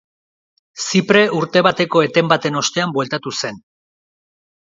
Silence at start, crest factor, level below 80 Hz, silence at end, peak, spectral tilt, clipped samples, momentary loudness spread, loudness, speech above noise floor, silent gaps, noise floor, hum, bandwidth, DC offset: 0.75 s; 18 dB; -60 dBFS; 1.1 s; 0 dBFS; -4 dB/octave; under 0.1%; 10 LU; -16 LUFS; over 74 dB; none; under -90 dBFS; none; 7.8 kHz; under 0.1%